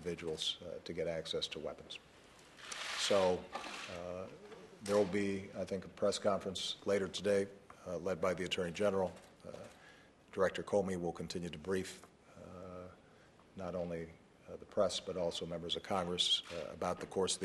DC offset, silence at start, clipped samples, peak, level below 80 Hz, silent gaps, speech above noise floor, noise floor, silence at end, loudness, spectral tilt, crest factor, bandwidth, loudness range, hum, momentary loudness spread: under 0.1%; 0 s; under 0.1%; -20 dBFS; -68 dBFS; none; 25 dB; -63 dBFS; 0 s; -38 LUFS; -3.5 dB/octave; 18 dB; 12.5 kHz; 6 LU; none; 19 LU